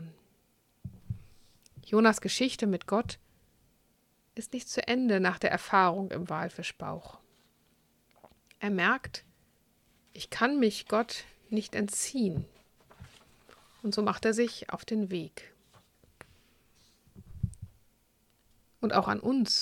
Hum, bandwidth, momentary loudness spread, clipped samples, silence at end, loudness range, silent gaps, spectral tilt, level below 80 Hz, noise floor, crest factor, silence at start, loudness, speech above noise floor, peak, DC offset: none; 16 kHz; 19 LU; under 0.1%; 0 s; 7 LU; none; -4.5 dB/octave; -60 dBFS; -70 dBFS; 24 dB; 0 s; -30 LUFS; 40 dB; -10 dBFS; under 0.1%